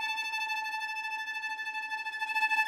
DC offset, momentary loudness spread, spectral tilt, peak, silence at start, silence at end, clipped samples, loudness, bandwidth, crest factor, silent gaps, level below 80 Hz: under 0.1%; 5 LU; 2.5 dB/octave; -16 dBFS; 0 s; 0 s; under 0.1%; -33 LUFS; 16 kHz; 18 dB; none; -82 dBFS